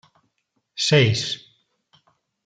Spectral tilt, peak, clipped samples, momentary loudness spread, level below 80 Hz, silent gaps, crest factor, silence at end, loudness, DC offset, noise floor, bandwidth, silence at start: -4.5 dB/octave; -2 dBFS; under 0.1%; 16 LU; -60 dBFS; none; 22 dB; 1.1 s; -20 LUFS; under 0.1%; -73 dBFS; 9.4 kHz; 0.75 s